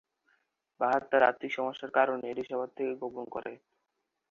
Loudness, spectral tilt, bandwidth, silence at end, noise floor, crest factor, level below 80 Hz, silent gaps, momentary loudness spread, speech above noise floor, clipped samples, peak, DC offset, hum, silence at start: -31 LUFS; -5.5 dB/octave; 7.2 kHz; 0.75 s; -83 dBFS; 22 dB; -76 dBFS; none; 13 LU; 52 dB; under 0.1%; -10 dBFS; under 0.1%; none; 0.8 s